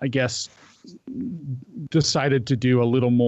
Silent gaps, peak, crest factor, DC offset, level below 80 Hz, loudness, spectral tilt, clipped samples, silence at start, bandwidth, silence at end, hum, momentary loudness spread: none; -10 dBFS; 14 dB; under 0.1%; -58 dBFS; -23 LUFS; -5.5 dB/octave; under 0.1%; 0 s; 8.2 kHz; 0 s; none; 15 LU